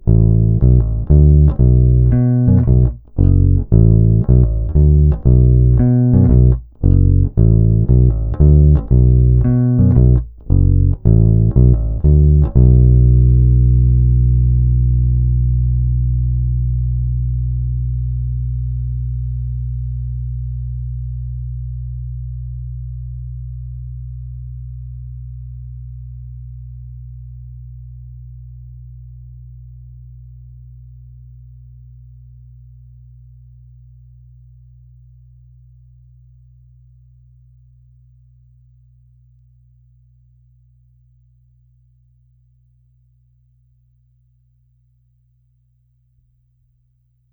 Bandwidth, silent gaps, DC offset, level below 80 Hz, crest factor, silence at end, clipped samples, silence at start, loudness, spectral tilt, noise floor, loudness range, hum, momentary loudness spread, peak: 1.7 kHz; none; under 0.1%; -18 dBFS; 16 dB; 17.65 s; under 0.1%; 0.05 s; -14 LUFS; -16 dB/octave; -60 dBFS; 21 LU; none; 22 LU; 0 dBFS